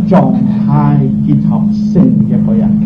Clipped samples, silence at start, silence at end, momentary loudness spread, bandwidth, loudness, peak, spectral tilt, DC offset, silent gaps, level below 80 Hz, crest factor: under 0.1%; 0 s; 0 s; 2 LU; 5.4 kHz; -10 LUFS; 0 dBFS; -11 dB/octave; under 0.1%; none; -34 dBFS; 8 dB